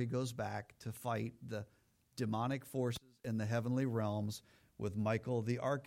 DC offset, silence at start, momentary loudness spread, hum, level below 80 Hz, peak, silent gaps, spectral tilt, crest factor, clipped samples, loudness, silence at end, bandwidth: under 0.1%; 0 s; 10 LU; none; -70 dBFS; -24 dBFS; none; -6.5 dB/octave; 16 dB; under 0.1%; -40 LUFS; 0 s; 16.5 kHz